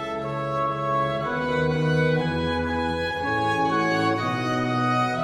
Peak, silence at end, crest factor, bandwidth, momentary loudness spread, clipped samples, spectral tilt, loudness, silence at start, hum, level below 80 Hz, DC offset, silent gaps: -10 dBFS; 0 s; 12 dB; 12.5 kHz; 4 LU; under 0.1%; -6.5 dB/octave; -24 LUFS; 0 s; none; -46 dBFS; under 0.1%; none